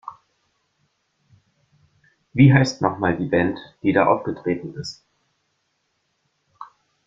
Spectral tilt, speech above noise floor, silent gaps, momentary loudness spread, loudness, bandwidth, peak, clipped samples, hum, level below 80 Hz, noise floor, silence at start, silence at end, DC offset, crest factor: -7 dB/octave; 52 dB; none; 28 LU; -20 LUFS; 7.6 kHz; -2 dBFS; under 0.1%; none; -54 dBFS; -71 dBFS; 0.05 s; 0.4 s; under 0.1%; 22 dB